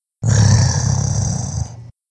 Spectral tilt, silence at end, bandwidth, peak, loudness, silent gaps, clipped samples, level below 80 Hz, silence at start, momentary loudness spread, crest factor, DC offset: -5 dB/octave; 0.2 s; 10 kHz; -2 dBFS; -17 LUFS; none; under 0.1%; -30 dBFS; 0.2 s; 12 LU; 16 dB; under 0.1%